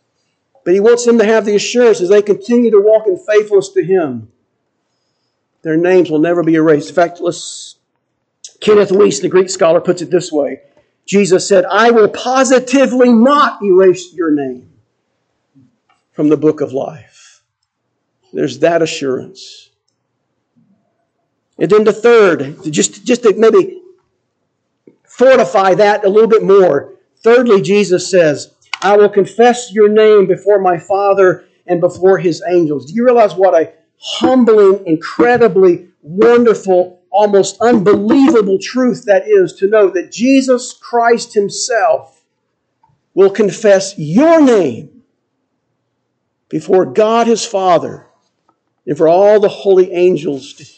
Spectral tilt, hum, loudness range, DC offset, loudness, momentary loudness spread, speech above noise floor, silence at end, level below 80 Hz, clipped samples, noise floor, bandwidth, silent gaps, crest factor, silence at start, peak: -5 dB/octave; none; 7 LU; under 0.1%; -11 LUFS; 11 LU; 59 dB; 0.15 s; -62 dBFS; under 0.1%; -69 dBFS; 9 kHz; none; 12 dB; 0.65 s; 0 dBFS